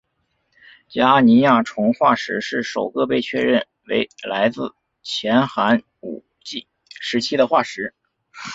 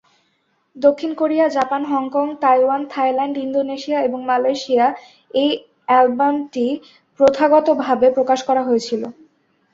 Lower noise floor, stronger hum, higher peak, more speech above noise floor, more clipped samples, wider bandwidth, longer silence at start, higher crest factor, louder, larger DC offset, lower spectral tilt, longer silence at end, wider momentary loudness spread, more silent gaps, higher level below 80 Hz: first, -69 dBFS vs -65 dBFS; neither; about the same, -2 dBFS vs -2 dBFS; about the same, 51 dB vs 48 dB; neither; about the same, 7.8 kHz vs 7.8 kHz; first, 0.9 s vs 0.75 s; about the same, 18 dB vs 16 dB; about the same, -19 LUFS vs -18 LUFS; neither; about the same, -5 dB/octave vs -4.5 dB/octave; second, 0 s vs 0.6 s; first, 18 LU vs 7 LU; neither; about the same, -62 dBFS vs -62 dBFS